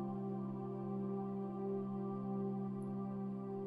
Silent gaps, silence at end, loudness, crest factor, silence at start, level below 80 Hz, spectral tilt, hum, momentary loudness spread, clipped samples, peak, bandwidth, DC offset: none; 0 s; -42 LUFS; 10 dB; 0 s; -76 dBFS; -11.5 dB/octave; none; 2 LU; under 0.1%; -32 dBFS; 3.3 kHz; under 0.1%